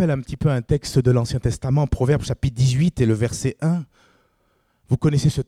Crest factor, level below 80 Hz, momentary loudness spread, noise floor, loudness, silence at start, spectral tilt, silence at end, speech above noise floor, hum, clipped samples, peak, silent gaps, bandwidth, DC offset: 14 dB; -38 dBFS; 5 LU; -65 dBFS; -21 LUFS; 0 s; -7 dB/octave; 0.05 s; 45 dB; none; under 0.1%; -6 dBFS; none; 13 kHz; under 0.1%